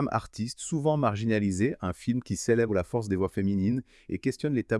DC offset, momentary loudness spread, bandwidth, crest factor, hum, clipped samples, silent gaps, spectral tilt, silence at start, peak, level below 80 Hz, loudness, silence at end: under 0.1%; 7 LU; 12 kHz; 16 dB; none; under 0.1%; none; -6.5 dB/octave; 0 s; -10 dBFS; -56 dBFS; -29 LUFS; 0 s